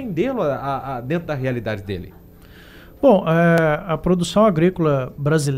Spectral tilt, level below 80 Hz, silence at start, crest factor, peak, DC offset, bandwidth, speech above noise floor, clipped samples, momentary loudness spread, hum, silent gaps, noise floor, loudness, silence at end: -7 dB/octave; -44 dBFS; 0 s; 16 dB; -4 dBFS; under 0.1%; 15 kHz; 25 dB; under 0.1%; 11 LU; none; none; -44 dBFS; -19 LUFS; 0 s